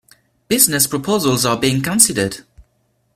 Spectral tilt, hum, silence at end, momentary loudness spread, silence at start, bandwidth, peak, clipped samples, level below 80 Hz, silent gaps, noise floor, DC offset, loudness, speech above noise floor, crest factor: -3 dB/octave; none; 0.55 s; 9 LU; 0.5 s; 16 kHz; 0 dBFS; under 0.1%; -50 dBFS; none; -63 dBFS; under 0.1%; -15 LUFS; 47 dB; 18 dB